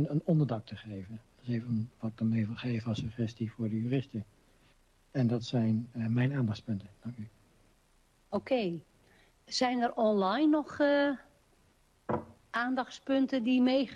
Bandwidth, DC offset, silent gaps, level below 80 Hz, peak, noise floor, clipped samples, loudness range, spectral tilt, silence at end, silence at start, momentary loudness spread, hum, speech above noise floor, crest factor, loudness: 9.8 kHz; under 0.1%; none; -66 dBFS; -16 dBFS; -67 dBFS; under 0.1%; 5 LU; -7 dB/octave; 0 s; 0 s; 16 LU; none; 36 dB; 16 dB; -32 LUFS